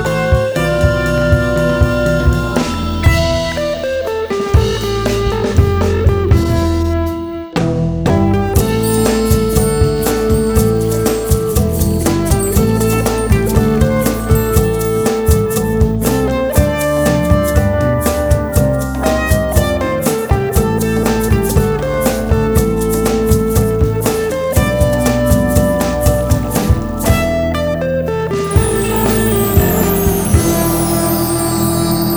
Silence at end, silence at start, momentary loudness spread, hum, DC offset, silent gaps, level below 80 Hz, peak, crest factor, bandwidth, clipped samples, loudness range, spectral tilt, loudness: 0 s; 0 s; 3 LU; none; under 0.1%; none; -20 dBFS; 0 dBFS; 12 dB; over 20 kHz; under 0.1%; 1 LU; -6 dB/octave; -14 LUFS